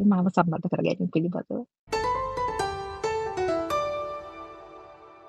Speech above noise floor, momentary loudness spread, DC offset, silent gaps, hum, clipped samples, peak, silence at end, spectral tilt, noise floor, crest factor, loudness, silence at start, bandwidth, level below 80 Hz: 23 dB; 18 LU; under 0.1%; 1.79-1.87 s; none; under 0.1%; -6 dBFS; 0 s; -7 dB/octave; -48 dBFS; 22 dB; -28 LUFS; 0 s; 12.5 kHz; -52 dBFS